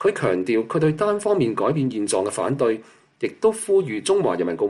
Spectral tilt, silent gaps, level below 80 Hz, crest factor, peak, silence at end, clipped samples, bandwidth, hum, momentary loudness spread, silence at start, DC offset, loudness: -5.5 dB/octave; none; -62 dBFS; 14 dB; -8 dBFS; 0 s; under 0.1%; 12.5 kHz; none; 3 LU; 0 s; under 0.1%; -22 LUFS